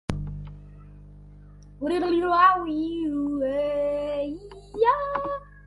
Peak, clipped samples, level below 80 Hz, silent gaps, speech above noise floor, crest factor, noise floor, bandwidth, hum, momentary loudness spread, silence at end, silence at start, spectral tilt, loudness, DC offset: -6 dBFS; under 0.1%; -46 dBFS; none; 24 dB; 20 dB; -47 dBFS; 11.5 kHz; 50 Hz at -50 dBFS; 18 LU; 0.05 s; 0.1 s; -7 dB/octave; -25 LUFS; under 0.1%